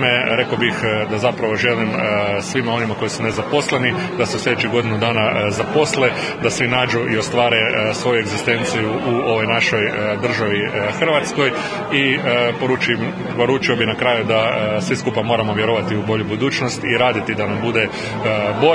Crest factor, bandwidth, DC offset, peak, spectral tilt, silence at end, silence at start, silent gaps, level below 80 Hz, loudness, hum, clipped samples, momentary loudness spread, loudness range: 18 dB; 10.5 kHz; under 0.1%; 0 dBFS; -4.5 dB/octave; 0 s; 0 s; none; -52 dBFS; -18 LUFS; none; under 0.1%; 4 LU; 2 LU